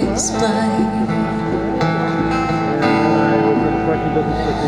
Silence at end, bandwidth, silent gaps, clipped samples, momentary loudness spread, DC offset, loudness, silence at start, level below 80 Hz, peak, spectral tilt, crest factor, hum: 0 s; 12 kHz; none; under 0.1%; 4 LU; 0.4%; -17 LUFS; 0 s; -36 dBFS; -2 dBFS; -5.5 dB/octave; 14 dB; none